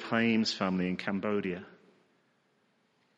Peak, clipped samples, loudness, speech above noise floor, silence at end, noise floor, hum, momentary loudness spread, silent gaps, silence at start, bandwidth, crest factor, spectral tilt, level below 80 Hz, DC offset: -14 dBFS; under 0.1%; -31 LUFS; 41 dB; 1.45 s; -72 dBFS; none; 8 LU; none; 0 s; 8 kHz; 20 dB; -5.5 dB/octave; -74 dBFS; under 0.1%